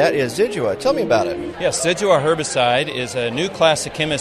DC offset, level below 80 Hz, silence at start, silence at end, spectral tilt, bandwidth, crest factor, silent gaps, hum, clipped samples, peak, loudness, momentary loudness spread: under 0.1%; -50 dBFS; 0 s; 0 s; -3.5 dB/octave; 13.5 kHz; 16 dB; none; none; under 0.1%; -2 dBFS; -18 LUFS; 6 LU